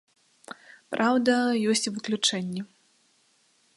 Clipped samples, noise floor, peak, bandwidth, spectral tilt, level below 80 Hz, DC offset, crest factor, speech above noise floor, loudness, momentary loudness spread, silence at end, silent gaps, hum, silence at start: under 0.1%; -66 dBFS; -10 dBFS; 11.5 kHz; -3.5 dB/octave; -76 dBFS; under 0.1%; 20 dB; 41 dB; -25 LUFS; 22 LU; 1.1 s; none; none; 0.5 s